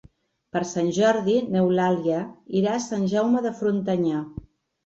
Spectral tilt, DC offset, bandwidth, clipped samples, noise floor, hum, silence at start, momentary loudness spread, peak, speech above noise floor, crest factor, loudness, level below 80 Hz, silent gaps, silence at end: -6 dB/octave; under 0.1%; 8 kHz; under 0.1%; -56 dBFS; none; 0.55 s; 8 LU; -6 dBFS; 33 dB; 16 dB; -24 LUFS; -56 dBFS; none; 0.5 s